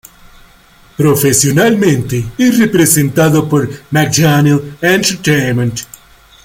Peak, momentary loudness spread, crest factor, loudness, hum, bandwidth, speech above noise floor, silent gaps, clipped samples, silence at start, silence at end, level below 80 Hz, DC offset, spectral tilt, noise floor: 0 dBFS; 7 LU; 12 dB; -11 LUFS; none; 17 kHz; 33 dB; none; under 0.1%; 1 s; 0.6 s; -42 dBFS; under 0.1%; -4.5 dB/octave; -44 dBFS